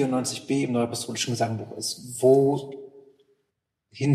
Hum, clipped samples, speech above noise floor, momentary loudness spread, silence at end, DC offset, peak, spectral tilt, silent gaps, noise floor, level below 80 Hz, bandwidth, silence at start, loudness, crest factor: none; under 0.1%; 55 dB; 11 LU; 0 s; under 0.1%; -8 dBFS; -5 dB/octave; none; -80 dBFS; -72 dBFS; 14.5 kHz; 0 s; -25 LUFS; 18 dB